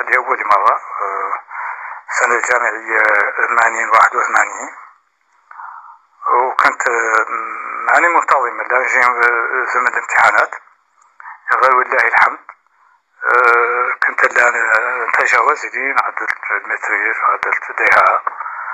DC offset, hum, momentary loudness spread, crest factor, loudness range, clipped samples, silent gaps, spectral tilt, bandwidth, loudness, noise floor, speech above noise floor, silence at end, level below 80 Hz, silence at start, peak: under 0.1%; none; 12 LU; 16 dB; 3 LU; under 0.1%; none; -1 dB/octave; 14 kHz; -14 LUFS; -57 dBFS; 43 dB; 0 s; -64 dBFS; 0 s; 0 dBFS